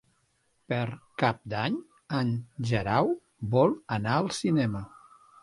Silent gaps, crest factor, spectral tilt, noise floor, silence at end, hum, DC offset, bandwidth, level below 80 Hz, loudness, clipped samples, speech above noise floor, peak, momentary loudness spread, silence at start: none; 20 dB; -6.5 dB/octave; -71 dBFS; 0.55 s; none; under 0.1%; 11.5 kHz; -58 dBFS; -29 LUFS; under 0.1%; 44 dB; -8 dBFS; 9 LU; 0.7 s